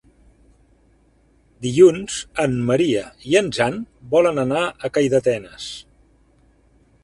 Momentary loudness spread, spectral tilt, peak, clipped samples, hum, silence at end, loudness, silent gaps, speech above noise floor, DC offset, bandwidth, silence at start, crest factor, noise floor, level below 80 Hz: 17 LU; -5.5 dB/octave; -2 dBFS; under 0.1%; none; 1.25 s; -19 LUFS; none; 39 dB; under 0.1%; 11.5 kHz; 1.6 s; 20 dB; -57 dBFS; -52 dBFS